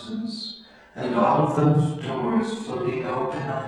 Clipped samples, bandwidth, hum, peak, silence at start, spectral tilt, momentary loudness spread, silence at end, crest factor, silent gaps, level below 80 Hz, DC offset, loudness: under 0.1%; 10.5 kHz; none; -6 dBFS; 0 s; -7.5 dB/octave; 13 LU; 0 s; 18 dB; none; -60 dBFS; under 0.1%; -24 LUFS